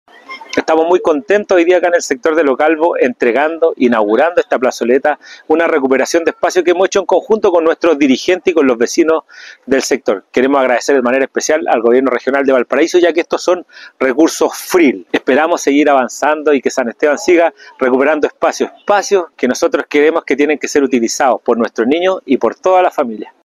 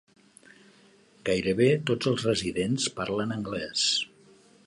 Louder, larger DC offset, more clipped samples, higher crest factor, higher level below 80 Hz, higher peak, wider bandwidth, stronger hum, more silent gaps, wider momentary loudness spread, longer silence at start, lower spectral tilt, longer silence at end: first, -13 LUFS vs -27 LUFS; neither; neither; second, 12 dB vs 18 dB; about the same, -56 dBFS vs -58 dBFS; first, 0 dBFS vs -10 dBFS; first, 14 kHz vs 11.5 kHz; neither; neither; second, 5 LU vs 8 LU; second, 0.3 s vs 1.25 s; about the same, -3.5 dB/octave vs -4 dB/octave; second, 0.15 s vs 0.6 s